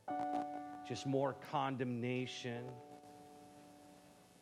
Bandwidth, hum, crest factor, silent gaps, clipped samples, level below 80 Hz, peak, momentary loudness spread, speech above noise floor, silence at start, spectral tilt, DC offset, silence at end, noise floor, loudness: 14.5 kHz; none; 20 dB; none; under 0.1%; -82 dBFS; -24 dBFS; 21 LU; 23 dB; 0.05 s; -6 dB/octave; under 0.1%; 0.1 s; -63 dBFS; -41 LUFS